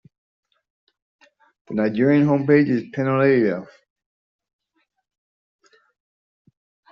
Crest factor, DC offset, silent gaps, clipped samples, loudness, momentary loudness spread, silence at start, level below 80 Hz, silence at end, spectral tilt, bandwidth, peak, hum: 20 dB; under 0.1%; none; under 0.1%; -19 LUFS; 7 LU; 1.7 s; -66 dBFS; 3.3 s; -7.5 dB/octave; 6.2 kHz; -4 dBFS; none